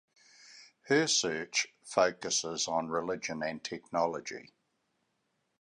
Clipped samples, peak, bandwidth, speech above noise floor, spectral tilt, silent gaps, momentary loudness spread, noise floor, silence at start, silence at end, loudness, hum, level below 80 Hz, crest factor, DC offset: under 0.1%; -12 dBFS; 11 kHz; 47 dB; -2 dB/octave; none; 10 LU; -79 dBFS; 0.45 s; 1.15 s; -31 LUFS; none; -72 dBFS; 22 dB; under 0.1%